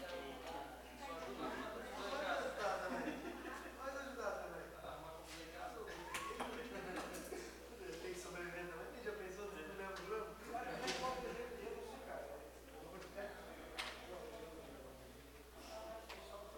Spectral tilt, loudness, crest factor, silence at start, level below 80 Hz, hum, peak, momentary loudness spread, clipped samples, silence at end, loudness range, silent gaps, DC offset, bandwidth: -3.5 dB/octave; -48 LUFS; 20 dB; 0 s; -64 dBFS; none; -28 dBFS; 11 LU; under 0.1%; 0 s; 7 LU; none; under 0.1%; 17 kHz